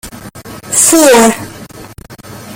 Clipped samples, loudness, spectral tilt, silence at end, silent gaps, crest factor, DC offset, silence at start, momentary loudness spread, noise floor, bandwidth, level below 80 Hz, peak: 0.2%; -7 LUFS; -2.5 dB/octave; 0 s; none; 12 dB; under 0.1%; 0.05 s; 25 LU; -31 dBFS; over 20 kHz; -42 dBFS; 0 dBFS